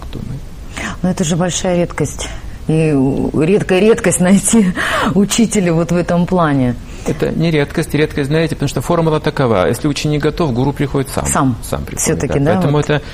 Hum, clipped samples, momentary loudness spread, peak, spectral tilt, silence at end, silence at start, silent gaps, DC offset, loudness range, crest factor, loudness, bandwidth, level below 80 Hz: none; under 0.1%; 10 LU; 0 dBFS; -5.5 dB/octave; 0 s; 0 s; none; under 0.1%; 3 LU; 14 dB; -14 LUFS; 15.5 kHz; -30 dBFS